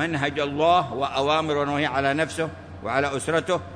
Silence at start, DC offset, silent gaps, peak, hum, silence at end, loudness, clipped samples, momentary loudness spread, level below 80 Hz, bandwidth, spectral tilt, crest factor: 0 s; under 0.1%; none; -6 dBFS; none; 0 s; -24 LUFS; under 0.1%; 7 LU; -54 dBFS; 10.5 kHz; -5 dB/octave; 16 dB